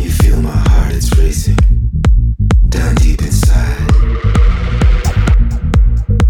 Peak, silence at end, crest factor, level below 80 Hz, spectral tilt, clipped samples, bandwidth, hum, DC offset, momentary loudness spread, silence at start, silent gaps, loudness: 0 dBFS; 0 s; 10 dB; -10 dBFS; -6 dB/octave; under 0.1%; 14.5 kHz; none; under 0.1%; 1 LU; 0 s; none; -13 LUFS